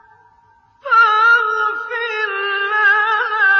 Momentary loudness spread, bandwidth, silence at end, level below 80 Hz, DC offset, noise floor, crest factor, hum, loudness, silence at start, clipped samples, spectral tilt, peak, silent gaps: 9 LU; 6.4 kHz; 0 s; -70 dBFS; under 0.1%; -53 dBFS; 12 dB; none; -14 LUFS; 0.85 s; under 0.1%; -1 dB/octave; -4 dBFS; none